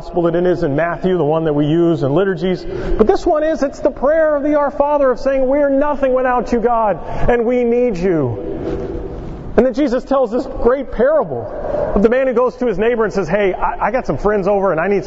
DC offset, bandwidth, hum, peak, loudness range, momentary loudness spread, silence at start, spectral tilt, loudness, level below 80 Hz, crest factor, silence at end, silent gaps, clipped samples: under 0.1%; 7.8 kHz; none; 0 dBFS; 2 LU; 7 LU; 0 s; -8 dB/octave; -16 LUFS; -30 dBFS; 16 dB; 0 s; none; under 0.1%